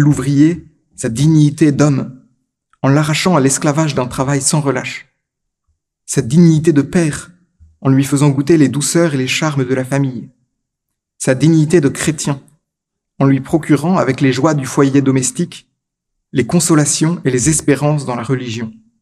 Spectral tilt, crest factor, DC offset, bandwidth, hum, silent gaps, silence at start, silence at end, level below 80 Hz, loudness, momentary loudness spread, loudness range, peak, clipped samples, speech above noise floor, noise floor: -5.5 dB/octave; 14 dB; under 0.1%; 14 kHz; none; none; 0 s; 0.3 s; -46 dBFS; -14 LUFS; 10 LU; 2 LU; 0 dBFS; under 0.1%; 65 dB; -77 dBFS